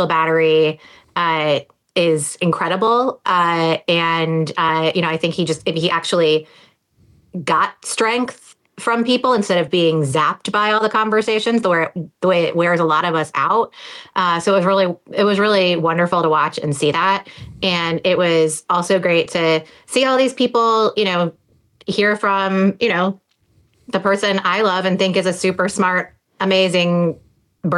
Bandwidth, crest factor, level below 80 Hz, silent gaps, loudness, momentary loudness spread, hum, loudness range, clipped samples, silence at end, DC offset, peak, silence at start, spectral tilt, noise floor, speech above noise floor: 12.5 kHz; 12 dB; -62 dBFS; none; -17 LUFS; 7 LU; none; 3 LU; under 0.1%; 0 s; under 0.1%; -6 dBFS; 0 s; -4.5 dB/octave; -58 dBFS; 41 dB